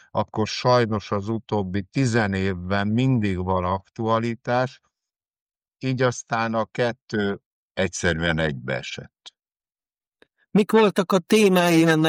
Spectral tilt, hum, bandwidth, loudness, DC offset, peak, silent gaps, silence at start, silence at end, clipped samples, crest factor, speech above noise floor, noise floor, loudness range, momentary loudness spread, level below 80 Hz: -5.5 dB/octave; none; 15.5 kHz; -23 LUFS; under 0.1%; -8 dBFS; 5.42-5.46 s, 7.02-7.06 s, 7.45-7.75 s; 0.15 s; 0 s; under 0.1%; 16 dB; over 68 dB; under -90 dBFS; 4 LU; 11 LU; -52 dBFS